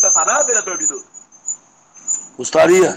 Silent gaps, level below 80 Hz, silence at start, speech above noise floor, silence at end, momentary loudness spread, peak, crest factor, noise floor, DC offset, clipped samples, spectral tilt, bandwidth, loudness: none; -60 dBFS; 0 s; 31 dB; 0 s; 18 LU; 0 dBFS; 16 dB; -46 dBFS; under 0.1%; under 0.1%; -2 dB/octave; 15.5 kHz; -15 LUFS